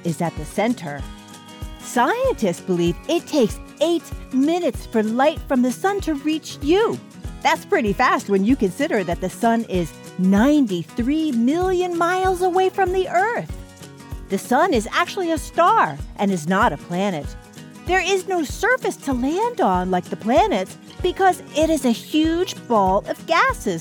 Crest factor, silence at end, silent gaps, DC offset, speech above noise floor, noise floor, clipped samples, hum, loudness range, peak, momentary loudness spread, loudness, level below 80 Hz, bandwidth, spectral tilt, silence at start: 14 dB; 0 s; none; under 0.1%; 20 dB; -40 dBFS; under 0.1%; none; 2 LU; -6 dBFS; 10 LU; -20 LUFS; -40 dBFS; 19 kHz; -5 dB/octave; 0 s